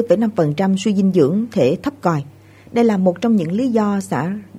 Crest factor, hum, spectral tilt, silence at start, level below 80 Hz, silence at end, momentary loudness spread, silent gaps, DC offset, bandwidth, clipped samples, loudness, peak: 16 dB; none; -7.5 dB/octave; 0 s; -56 dBFS; 0 s; 7 LU; none; under 0.1%; 12.5 kHz; under 0.1%; -17 LUFS; -2 dBFS